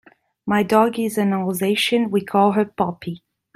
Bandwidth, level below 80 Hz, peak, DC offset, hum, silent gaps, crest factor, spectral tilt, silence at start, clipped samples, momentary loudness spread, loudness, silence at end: 16 kHz; -62 dBFS; -2 dBFS; under 0.1%; none; none; 18 dB; -5.5 dB/octave; 0.45 s; under 0.1%; 15 LU; -19 LUFS; 0.4 s